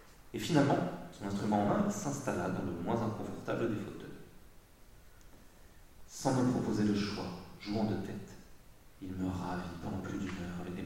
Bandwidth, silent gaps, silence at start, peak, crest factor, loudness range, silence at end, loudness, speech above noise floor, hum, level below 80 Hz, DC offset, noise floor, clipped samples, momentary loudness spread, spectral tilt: 16 kHz; none; 0 s; -14 dBFS; 22 dB; 6 LU; 0 s; -35 LUFS; 23 dB; none; -58 dBFS; under 0.1%; -57 dBFS; under 0.1%; 15 LU; -6 dB/octave